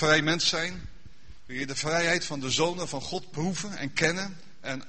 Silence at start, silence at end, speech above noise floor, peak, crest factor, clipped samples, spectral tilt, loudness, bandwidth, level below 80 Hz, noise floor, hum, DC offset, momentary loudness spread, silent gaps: 0 s; 0.05 s; 24 dB; -6 dBFS; 24 dB; under 0.1%; -3 dB/octave; -28 LUFS; 8.8 kHz; -54 dBFS; -52 dBFS; none; 0.9%; 14 LU; none